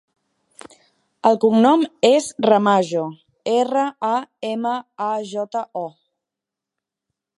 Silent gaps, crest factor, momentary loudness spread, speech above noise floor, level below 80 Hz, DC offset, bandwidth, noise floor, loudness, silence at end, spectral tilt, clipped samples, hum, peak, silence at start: none; 20 dB; 13 LU; 67 dB; -74 dBFS; under 0.1%; 11.5 kHz; -86 dBFS; -19 LUFS; 1.5 s; -5 dB/octave; under 0.1%; none; -2 dBFS; 1.25 s